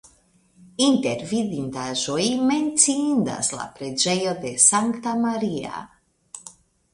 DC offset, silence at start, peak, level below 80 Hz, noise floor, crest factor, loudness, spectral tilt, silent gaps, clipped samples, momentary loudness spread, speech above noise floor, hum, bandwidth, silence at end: under 0.1%; 0.8 s; -2 dBFS; -62 dBFS; -59 dBFS; 22 dB; -21 LUFS; -3 dB/octave; none; under 0.1%; 19 LU; 37 dB; none; 11.5 kHz; 0.45 s